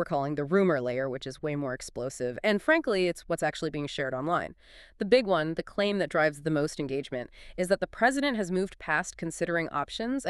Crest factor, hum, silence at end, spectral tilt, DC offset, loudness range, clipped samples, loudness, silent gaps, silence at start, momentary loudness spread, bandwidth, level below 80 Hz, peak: 20 dB; none; 0 s; -5 dB/octave; under 0.1%; 1 LU; under 0.1%; -29 LUFS; none; 0 s; 10 LU; 13 kHz; -56 dBFS; -8 dBFS